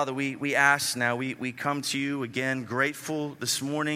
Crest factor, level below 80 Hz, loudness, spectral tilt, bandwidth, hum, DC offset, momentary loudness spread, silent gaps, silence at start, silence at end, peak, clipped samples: 22 dB; -72 dBFS; -27 LUFS; -3.5 dB/octave; 16 kHz; none; under 0.1%; 9 LU; none; 0 s; 0 s; -6 dBFS; under 0.1%